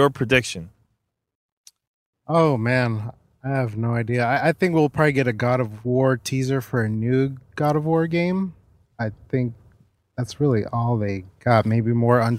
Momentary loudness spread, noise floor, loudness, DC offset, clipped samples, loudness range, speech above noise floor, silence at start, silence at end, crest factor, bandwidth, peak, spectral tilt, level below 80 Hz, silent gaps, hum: 12 LU; -74 dBFS; -22 LUFS; under 0.1%; under 0.1%; 4 LU; 54 dB; 0 s; 0 s; 20 dB; 15 kHz; -2 dBFS; -7 dB/octave; -54 dBFS; 1.35-1.64 s, 1.87-2.13 s; none